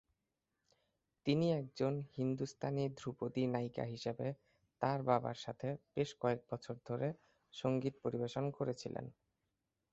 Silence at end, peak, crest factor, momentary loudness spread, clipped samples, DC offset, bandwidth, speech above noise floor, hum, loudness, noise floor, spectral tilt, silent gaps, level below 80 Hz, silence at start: 0.8 s; -18 dBFS; 22 dB; 9 LU; under 0.1%; under 0.1%; 8 kHz; 49 dB; none; -40 LUFS; -88 dBFS; -6.5 dB/octave; none; -74 dBFS; 1.25 s